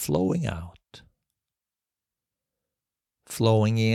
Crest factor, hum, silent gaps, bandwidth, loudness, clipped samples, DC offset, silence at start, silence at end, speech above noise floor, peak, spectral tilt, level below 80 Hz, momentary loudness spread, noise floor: 20 dB; none; none; 15.5 kHz; -24 LUFS; under 0.1%; under 0.1%; 0 s; 0 s; over 67 dB; -8 dBFS; -6 dB/octave; -54 dBFS; 17 LU; under -90 dBFS